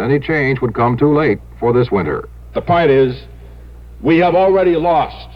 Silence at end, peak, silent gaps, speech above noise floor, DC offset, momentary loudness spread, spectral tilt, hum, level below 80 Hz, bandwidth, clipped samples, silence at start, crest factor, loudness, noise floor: 0 s; -2 dBFS; none; 21 dB; 0.3%; 10 LU; -9 dB/octave; none; -36 dBFS; 5.6 kHz; under 0.1%; 0 s; 12 dB; -14 LUFS; -35 dBFS